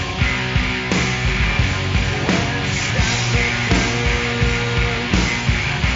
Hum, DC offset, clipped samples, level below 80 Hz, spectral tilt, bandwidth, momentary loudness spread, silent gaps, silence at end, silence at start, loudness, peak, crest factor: none; under 0.1%; under 0.1%; -26 dBFS; -3.5 dB/octave; 7.6 kHz; 2 LU; none; 0 s; 0 s; -18 LUFS; -2 dBFS; 16 dB